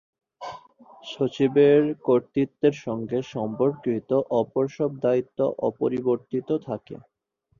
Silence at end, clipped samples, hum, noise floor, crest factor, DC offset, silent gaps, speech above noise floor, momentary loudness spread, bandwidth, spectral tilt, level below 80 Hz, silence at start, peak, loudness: 0.65 s; under 0.1%; none; -50 dBFS; 16 dB; under 0.1%; none; 27 dB; 19 LU; 7.2 kHz; -8 dB/octave; -66 dBFS; 0.4 s; -8 dBFS; -24 LUFS